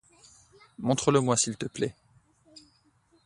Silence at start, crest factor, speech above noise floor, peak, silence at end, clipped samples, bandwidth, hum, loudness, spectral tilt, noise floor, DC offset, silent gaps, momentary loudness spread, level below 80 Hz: 0.8 s; 22 dB; 39 dB; -8 dBFS; 0.65 s; under 0.1%; 11.5 kHz; none; -27 LUFS; -4.5 dB/octave; -66 dBFS; under 0.1%; none; 10 LU; -64 dBFS